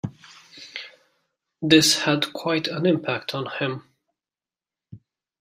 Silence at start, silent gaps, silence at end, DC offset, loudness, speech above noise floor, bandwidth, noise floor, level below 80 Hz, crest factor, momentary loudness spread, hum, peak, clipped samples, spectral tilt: 0.05 s; none; 0.45 s; under 0.1%; -21 LUFS; over 68 dB; 16 kHz; under -90 dBFS; -64 dBFS; 24 dB; 21 LU; none; -2 dBFS; under 0.1%; -3.5 dB/octave